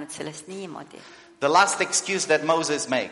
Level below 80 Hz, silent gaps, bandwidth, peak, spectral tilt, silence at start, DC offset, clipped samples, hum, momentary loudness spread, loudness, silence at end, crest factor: -72 dBFS; none; 11.5 kHz; -4 dBFS; -2 dB/octave; 0 s; under 0.1%; under 0.1%; none; 18 LU; -22 LUFS; 0 s; 20 dB